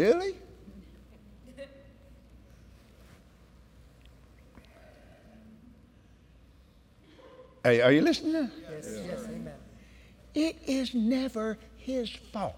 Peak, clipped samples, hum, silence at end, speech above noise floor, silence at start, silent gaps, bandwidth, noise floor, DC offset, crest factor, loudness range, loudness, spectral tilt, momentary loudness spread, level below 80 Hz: -10 dBFS; under 0.1%; none; 0 s; 30 dB; 0 s; none; 16.5 kHz; -58 dBFS; under 0.1%; 22 dB; 7 LU; -29 LUFS; -5.5 dB/octave; 28 LU; -58 dBFS